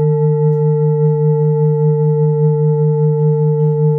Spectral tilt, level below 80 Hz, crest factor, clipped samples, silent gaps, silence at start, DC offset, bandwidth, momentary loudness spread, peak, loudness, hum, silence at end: -15 dB/octave; -62 dBFS; 6 dB; under 0.1%; none; 0 s; under 0.1%; 2 kHz; 0 LU; -6 dBFS; -14 LUFS; none; 0 s